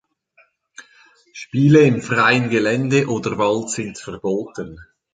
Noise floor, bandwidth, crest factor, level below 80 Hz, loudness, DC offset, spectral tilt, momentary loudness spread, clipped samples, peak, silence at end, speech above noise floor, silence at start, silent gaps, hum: -58 dBFS; 9.4 kHz; 18 dB; -54 dBFS; -18 LUFS; under 0.1%; -6 dB/octave; 17 LU; under 0.1%; -2 dBFS; 0.3 s; 40 dB; 0.8 s; none; none